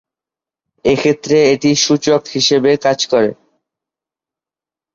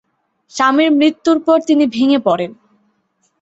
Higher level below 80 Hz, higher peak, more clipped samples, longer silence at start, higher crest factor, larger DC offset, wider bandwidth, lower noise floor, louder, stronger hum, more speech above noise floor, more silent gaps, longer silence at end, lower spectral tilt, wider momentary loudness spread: first, -52 dBFS vs -62 dBFS; about the same, 0 dBFS vs -2 dBFS; neither; first, 0.85 s vs 0.55 s; about the same, 16 dB vs 14 dB; neither; about the same, 7.6 kHz vs 8 kHz; first, -89 dBFS vs -64 dBFS; about the same, -13 LUFS vs -14 LUFS; neither; first, 76 dB vs 51 dB; neither; first, 1.6 s vs 0.9 s; about the same, -4 dB/octave vs -4.5 dB/octave; second, 4 LU vs 8 LU